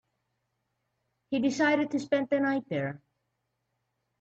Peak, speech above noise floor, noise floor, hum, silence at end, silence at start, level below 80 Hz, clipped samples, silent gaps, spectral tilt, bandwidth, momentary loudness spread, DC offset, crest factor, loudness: -14 dBFS; 53 dB; -80 dBFS; none; 1.25 s; 1.3 s; -74 dBFS; under 0.1%; none; -5.5 dB/octave; 8 kHz; 9 LU; under 0.1%; 18 dB; -29 LUFS